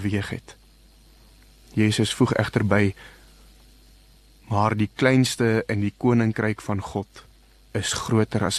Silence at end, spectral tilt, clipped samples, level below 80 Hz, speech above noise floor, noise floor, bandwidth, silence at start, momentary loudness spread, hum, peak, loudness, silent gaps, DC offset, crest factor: 0 s; -5.5 dB/octave; under 0.1%; -50 dBFS; 30 dB; -53 dBFS; 13 kHz; 0 s; 12 LU; none; -4 dBFS; -23 LUFS; none; under 0.1%; 20 dB